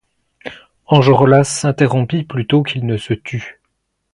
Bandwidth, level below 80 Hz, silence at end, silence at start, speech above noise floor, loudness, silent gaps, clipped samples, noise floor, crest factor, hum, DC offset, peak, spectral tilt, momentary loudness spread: 11.5 kHz; -50 dBFS; 0.6 s; 0.45 s; 56 dB; -14 LUFS; none; under 0.1%; -70 dBFS; 16 dB; none; under 0.1%; 0 dBFS; -6 dB/octave; 23 LU